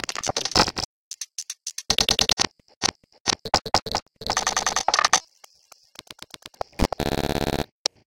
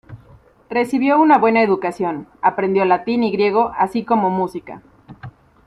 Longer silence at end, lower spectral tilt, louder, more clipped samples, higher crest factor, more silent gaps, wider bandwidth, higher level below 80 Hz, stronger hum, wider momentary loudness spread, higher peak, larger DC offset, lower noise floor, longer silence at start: first, 0.55 s vs 0.4 s; second, -1.5 dB/octave vs -7 dB/octave; second, -23 LUFS vs -17 LUFS; neither; first, 24 dB vs 16 dB; first, 0.85-1.11 s, 2.33-2.37 s, 2.76-2.81 s, 3.20-3.25 s, 3.82-3.86 s, 4.02-4.06 s vs none; first, 17 kHz vs 12.5 kHz; first, -40 dBFS vs -56 dBFS; neither; first, 16 LU vs 11 LU; about the same, -2 dBFS vs -2 dBFS; neither; first, -56 dBFS vs -48 dBFS; about the same, 0.1 s vs 0.1 s